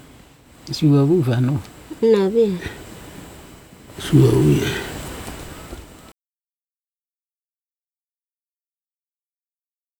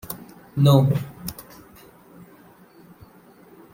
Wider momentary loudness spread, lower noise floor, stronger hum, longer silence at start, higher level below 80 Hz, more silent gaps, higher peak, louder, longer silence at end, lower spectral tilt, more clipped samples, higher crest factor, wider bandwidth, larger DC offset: about the same, 23 LU vs 23 LU; first, under -90 dBFS vs -50 dBFS; neither; first, 0.65 s vs 0.05 s; first, -44 dBFS vs -56 dBFS; neither; about the same, -2 dBFS vs -2 dBFS; first, -18 LUFS vs -21 LUFS; first, 4.15 s vs 2.3 s; about the same, -7 dB/octave vs -7.5 dB/octave; neither; about the same, 20 dB vs 22 dB; first, over 20 kHz vs 16.5 kHz; neither